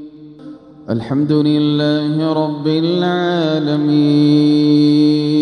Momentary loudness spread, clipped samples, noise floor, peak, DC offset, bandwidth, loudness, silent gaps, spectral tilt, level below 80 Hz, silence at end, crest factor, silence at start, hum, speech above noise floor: 6 LU; under 0.1%; -36 dBFS; -2 dBFS; under 0.1%; 9.2 kHz; -14 LUFS; none; -8 dB/octave; -60 dBFS; 0 s; 12 dB; 0 s; none; 22 dB